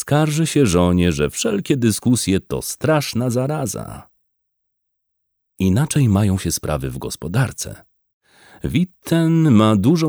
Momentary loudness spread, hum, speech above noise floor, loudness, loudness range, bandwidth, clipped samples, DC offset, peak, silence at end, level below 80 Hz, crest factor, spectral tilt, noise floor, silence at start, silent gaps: 12 LU; none; 56 dB; -18 LUFS; 5 LU; over 20 kHz; under 0.1%; under 0.1%; -2 dBFS; 0 s; -42 dBFS; 16 dB; -6 dB/octave; -74 dBFS; 0 s; 8.13-8.20 s